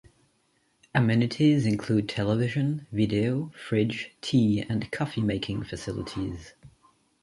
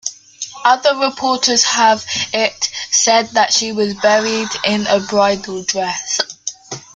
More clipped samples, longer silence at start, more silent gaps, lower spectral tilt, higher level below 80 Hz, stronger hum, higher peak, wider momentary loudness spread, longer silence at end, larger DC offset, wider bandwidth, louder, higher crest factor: neither; first, 0.95 s vs 0.05 s; neither; first, -7 dB/octave vs -1.5 dB/octave; about the same, -52 dBFS vs -56 dBFS; neither; second, -10 dBFS vs 0 dBFS; about the same, 11 LU vs 9 LU; first, 0.55 s vs 0.15 s; neither; about the same, 11.5 kHz vs 11 kHz; second, -27 LUFS vs -15 LUFS; about the same, 18 dB vs 16 dB